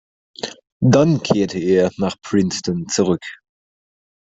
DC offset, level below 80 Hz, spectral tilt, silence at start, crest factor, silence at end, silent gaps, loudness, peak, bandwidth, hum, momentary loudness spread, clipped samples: under 0.1%; -54 dBFS; -6 dB/octave; 0.45 s; 18 dB; 0.9 s; 0.72-0.80 s; -18 LUFS; 0 dBFS; 8.2 kHz; none; 16 LU; under 0.1%